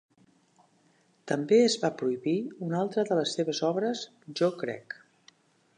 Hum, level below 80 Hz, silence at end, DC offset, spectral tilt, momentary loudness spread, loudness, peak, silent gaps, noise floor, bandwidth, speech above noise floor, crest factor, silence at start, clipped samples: none; -82 dBFS; 0.85 s; under 0.1%; -5 dB/octave; 15 LU; -28 LUFS; -10 dBFS; none; -66 dBFS; 10.5 kHz; 38 dB; 20 dB; 1.25 s; under 0.1%